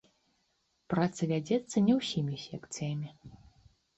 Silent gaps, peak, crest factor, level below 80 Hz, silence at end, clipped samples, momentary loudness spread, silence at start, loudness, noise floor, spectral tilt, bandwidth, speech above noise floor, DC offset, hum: none; -16 dBFS; 18 dB; -66 dBFS; 0.65 s; under 0.1%; 13 LU; 0.9 s; -32 LUFS; -76 dBFS; -6 dB/octave; 8.4 kHz; 45 dB; under 0.1%; none